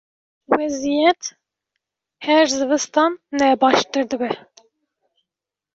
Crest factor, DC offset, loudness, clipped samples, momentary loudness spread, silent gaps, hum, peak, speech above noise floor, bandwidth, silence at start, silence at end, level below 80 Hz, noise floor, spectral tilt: 18 dB; under 0.1%; -19 LUFS; under 0.1%; 10 LU; none; none; -2 dBFS; 68 dB; 8 kHz; 0.5 s; 1.35 s; -62 dBFS; -86 dBFS; -2.5 dB/octave